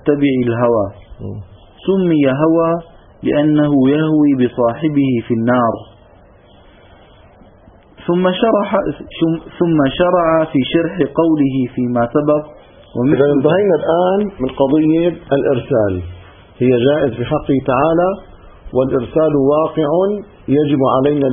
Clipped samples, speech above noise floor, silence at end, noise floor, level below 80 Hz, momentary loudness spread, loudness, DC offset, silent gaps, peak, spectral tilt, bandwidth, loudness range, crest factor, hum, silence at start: under 0.1%; 31 dB; 0 s; -45 dBFS; -42 dBFS; 8 LU; -15 LUFS; under 0.1%; none; 0 dBFS; -12.5 dB/octave; 3.7 kHz; 5 LU; 14 dB; none; 0.05 s